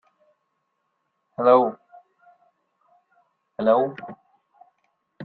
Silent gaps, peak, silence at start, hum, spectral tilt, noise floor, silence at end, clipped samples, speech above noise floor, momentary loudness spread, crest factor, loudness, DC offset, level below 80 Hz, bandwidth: none; -4 dBFS; 1.4 s; none; -9.5 dB/octave; -75 dBFS; 0 s; under 0.1%; 55 dB; 24 LU; 22 dB; -21 LUFS; under 0.1%; -74 dBFS; 4.6 kHz